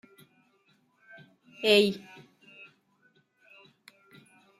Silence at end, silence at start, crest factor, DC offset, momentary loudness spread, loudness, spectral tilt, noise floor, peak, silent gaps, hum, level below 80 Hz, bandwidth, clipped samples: 2.6 s; 1.6 s; 24 dB; under 0.1%; 29 LU; -25 LUFS; -4 dB/octave; -68 dBFS; -8 dBFS; none; none; -80 dBFS; 14.5 kHz; under 0.1%